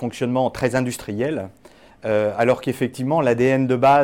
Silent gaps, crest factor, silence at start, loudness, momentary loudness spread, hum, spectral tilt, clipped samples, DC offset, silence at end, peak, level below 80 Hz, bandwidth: none; 14 dB; 0 s; -20 LUFS; 8 LU; none; -6.5 dB/octave; under 0.1%; 0.1%; 0 s; -6 dBFS; -52 dBFS; 16.5 kHz